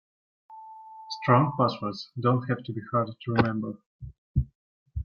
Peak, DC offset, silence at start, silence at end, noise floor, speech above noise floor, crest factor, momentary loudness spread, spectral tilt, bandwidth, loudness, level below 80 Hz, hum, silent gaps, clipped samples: -6 dBFS; under 0.1%; 0.5 s; 0 s; -45 dBFS; 19 dB; 22 dB; 23 LU; -8 dB/octave; 6.8 kHz; -27 LUFS; -44 dBFS; none; 3.86-3.99 s, 4.18-4.34 s, 4.55-4.86 s; under 0.1%